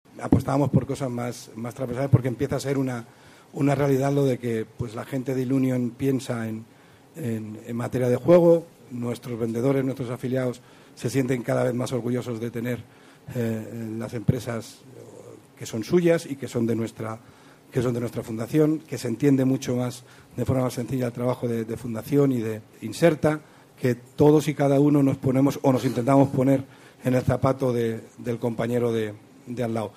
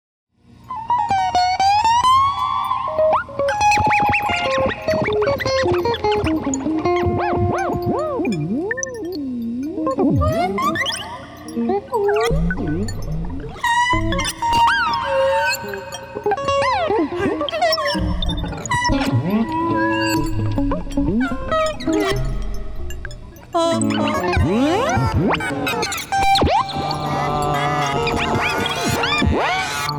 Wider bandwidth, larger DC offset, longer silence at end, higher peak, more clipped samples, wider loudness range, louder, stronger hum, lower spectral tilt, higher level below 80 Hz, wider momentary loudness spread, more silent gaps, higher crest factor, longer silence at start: second, 15.5 kHz vs over 20 kHz; neither; about the same, 0.05 s vs 0 s; about the same, -6 dBFS vs -8 dBFS; neither; about the same, 6 LU vs 4 LU; second, -25 LUFS vs -19 LUFS; neither; first, -7.5 dB/octave vs -5 dB/octave; second, -54 dBFS vs -32 dBFS; first, 13 LU vs 10 LU; neither; first, 18 dB vs 10 dB; second, 0.15 s vs 0.65 s